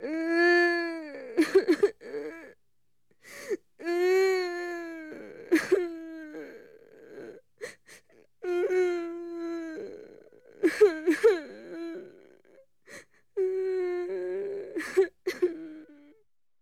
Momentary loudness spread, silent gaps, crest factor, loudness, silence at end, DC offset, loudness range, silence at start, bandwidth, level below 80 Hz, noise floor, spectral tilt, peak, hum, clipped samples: 22 LU; none; 20 dB; -28 LUFS; 0.7 s; under 0.1%; 6 LU; 0 s; 14.5 kHz; -72 dBFS; -81 dBFS; -3.5 dB/octave; -10 dBFS; none; under 0.1%